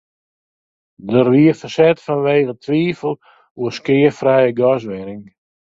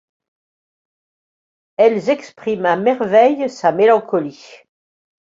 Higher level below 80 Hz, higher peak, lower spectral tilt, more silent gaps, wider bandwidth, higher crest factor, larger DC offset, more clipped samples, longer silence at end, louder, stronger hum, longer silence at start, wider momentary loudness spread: first, -58 dBFS vs -66 dBFS; about the same, 0 dBFS vs -2 dBFS; first, -7.5 dB/octave vs -6 dB/octave; first, 3.50-3.55 s vs none; about the same, 7.8 kHz vs 7.6 kHz; about the same, 16 dB vs 16 dB; neither; neither; second, 0.45 s vs 0.7 s; about the same, -16 LUFS vs -16 LUFS; neither; second, 1.05 s vs 1.8 s; first, 15 LU vs 9 LU